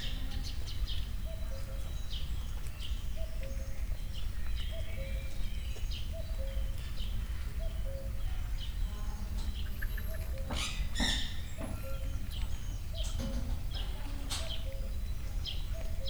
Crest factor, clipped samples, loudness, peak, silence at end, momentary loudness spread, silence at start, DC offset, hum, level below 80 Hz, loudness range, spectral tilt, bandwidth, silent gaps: 16 dB; under 0.1%; -40 LUFS; -20 dBFS; 0 s; 5 LU; 0 s; under 0.1%; none; -36 dBFS; 4 LU; -4 dB/octave; over 20 kHz; none